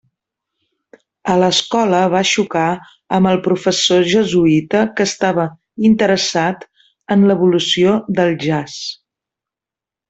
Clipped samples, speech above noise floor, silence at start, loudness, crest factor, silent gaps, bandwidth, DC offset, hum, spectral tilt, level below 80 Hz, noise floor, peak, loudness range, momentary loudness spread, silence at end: under 0.1%; 73 dB; 1.25 s; -15 LUFS; 14 dB; none; 8.2 kHz; under 0.1%; none; -4.5 dB/octave; -54 dBFS; -87 dBFS; -2 dBFS; 2 LU; 8 LU; 1.15 s